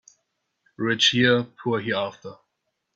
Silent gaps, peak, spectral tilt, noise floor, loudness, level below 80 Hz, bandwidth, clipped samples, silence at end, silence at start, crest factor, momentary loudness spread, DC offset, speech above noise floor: none; -6 dBFS; -4 dB/octave; -78 dBFS; -22 LUFS; -66 dBFS; 8 kHz; under 0.1%; 0.6 s; 0.8 s; 20 dB; 18 LU; under 0.1%; 55 dB